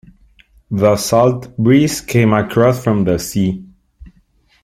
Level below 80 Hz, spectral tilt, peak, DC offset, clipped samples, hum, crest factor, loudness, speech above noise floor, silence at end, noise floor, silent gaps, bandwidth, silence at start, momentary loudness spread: -44 dBFS; -6 dB/octave; -2 dBFS; under 0.1%; under 0.1%; none; 14 dB; -14 LUFS; 41 dB; 0.55 s; -55 dBFS; none; 16 kHz; 0.7 s; 6 LU